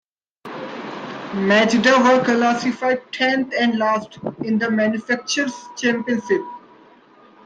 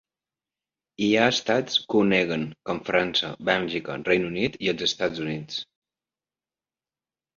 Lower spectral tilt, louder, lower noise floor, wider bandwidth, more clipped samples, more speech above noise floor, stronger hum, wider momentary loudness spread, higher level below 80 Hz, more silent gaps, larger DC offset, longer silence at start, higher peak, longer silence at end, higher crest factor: about the same, -4.5 dB/octave vs -4.5 dB/octave; first, -19 LUFS vs -24 LUFS; second, -49 dBFS vs under -90 dBFS; first, 9.2 kHz vs 7.6 kHz; neither; second, 31 dB vs over 65 dB; neither; first, 17 LU vs 11 LU; about the same, -64 dBFS vs -60 dBFS; neither; neither; second, 0.45 s vs 1 s; about the same, -2 dBFS vs -4 dBFS; second, 0.85 s vs 1.75 s; about the same, 18 dB vs 22 dB